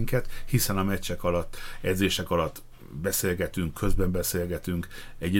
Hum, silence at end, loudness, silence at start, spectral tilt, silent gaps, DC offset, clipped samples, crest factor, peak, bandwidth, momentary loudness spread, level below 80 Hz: none; 0 s; -28 LUFS; 0 s; -4.5 dB/octave; none; under 0.1%; under 0.1%; 16 dB; -10 dBFS; 17 kHz; 8 LU; -36 dBFS